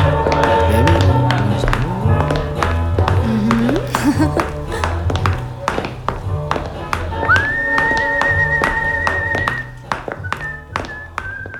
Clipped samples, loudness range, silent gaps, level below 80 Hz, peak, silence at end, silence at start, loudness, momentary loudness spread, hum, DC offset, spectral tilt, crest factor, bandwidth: under 0.1%; 4 LU; none; -28 dBFS; 0 dBFS; 0 s; 0 s; -17 LUFS; 11 LU; none; under 0.1%; -6.5 dB/octave; 16 dB; 17.5 kHz